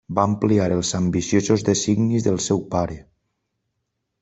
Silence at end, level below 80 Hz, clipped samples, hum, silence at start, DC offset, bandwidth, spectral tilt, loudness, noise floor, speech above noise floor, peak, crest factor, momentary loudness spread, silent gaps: 1.2 s; -50 dBFS; under 0.1%; none; 0.1 s; under 0.1%; 8.4 kHz; -5.5 dB/octave; -21 LUFS; -77 dBFS; 57 dB; -2 dBFS; 18 dB; 6 LU; none